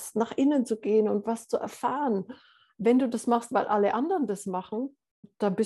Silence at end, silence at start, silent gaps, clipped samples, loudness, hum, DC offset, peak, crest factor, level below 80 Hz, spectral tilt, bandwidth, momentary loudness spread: 0 s; 0 s; 5.11-5.23 s; under 0.1%; -27 LUFS; none; under 0.1%; -12 dBFS; 16 dB; -76 dBFS; -6 dB/octave; 12.5 kHz; 8 LU